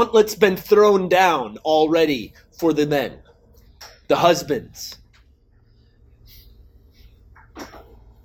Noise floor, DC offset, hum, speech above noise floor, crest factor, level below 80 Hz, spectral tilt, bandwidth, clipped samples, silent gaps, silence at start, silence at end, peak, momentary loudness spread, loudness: -55 dBFS; under 0.1%; none; 37 dB; 20 dB; -52 dBFS; -4.5 dB/octave; 18.5 kHz; under 0.1%; none; 0 s; 0.45 s; -2 dBFS; 21 LU; -18 LUFS